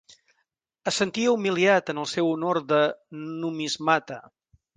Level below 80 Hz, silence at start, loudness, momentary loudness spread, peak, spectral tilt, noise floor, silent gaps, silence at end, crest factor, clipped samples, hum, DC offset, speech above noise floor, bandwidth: -70 dBFS; 0.85 s; -24 LUFS; 13 LU; -6 dBFS; -4 dB/octave; -76 dBFS; none; 0.55 s; 20 dB; under 0.1%; none; under 0.1%; 52 dB; 9.8 kHz